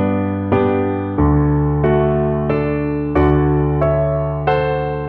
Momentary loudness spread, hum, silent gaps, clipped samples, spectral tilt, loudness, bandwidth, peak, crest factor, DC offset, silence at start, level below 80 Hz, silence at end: 4 LU; none; none; under 0.1%; -11.5 dB/octave; -17 LUFS; 4.5 kHz; -2 dBFS; 14 dB; under 0.1%; 0 s; -28 dBFS; 0 s